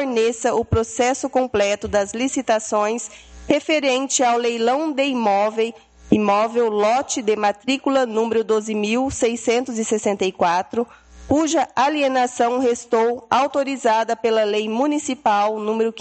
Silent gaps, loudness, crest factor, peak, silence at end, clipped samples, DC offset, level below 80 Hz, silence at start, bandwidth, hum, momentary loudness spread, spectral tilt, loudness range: none; -20 LUFS; 20 dB; 0 dBFS; 0 s; under 0.1%; under 0.1%; -48 dBFS; 0 s; 9 kHz; none; 4 LU; -4 dB/octave; 2 LU